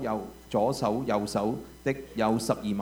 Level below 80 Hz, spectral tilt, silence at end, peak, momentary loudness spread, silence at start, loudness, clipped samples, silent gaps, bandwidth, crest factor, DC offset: -54 dBFS; -6 dB/octave; 0 s; -10 dBFS; 6 LU; 0 s; -29 LUFS; under 0.1%; none; over 20 kHz; 18 dB; under 0.1%